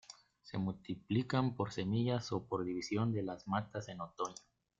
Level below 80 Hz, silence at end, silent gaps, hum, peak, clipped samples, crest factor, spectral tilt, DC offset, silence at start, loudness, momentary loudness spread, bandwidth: -70 dBFS; 0.45 s; none; none; -18 dBFS; under 0.1%; 20 dB; -6.5 dB/octave; under 0.1%; 0.1 s; -38 LUFS; 11 LU; 7.6 kHz